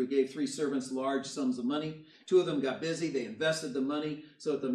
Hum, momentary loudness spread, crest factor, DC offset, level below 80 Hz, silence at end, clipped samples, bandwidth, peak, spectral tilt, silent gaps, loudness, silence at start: none; 7 LU; 16 dB; under 0.1%; -78 dBFS; 0 s; under 0.1%; 12.5 kHz; -16 dBFS; -5 dB/octave; none; -33 LUFS; 0 s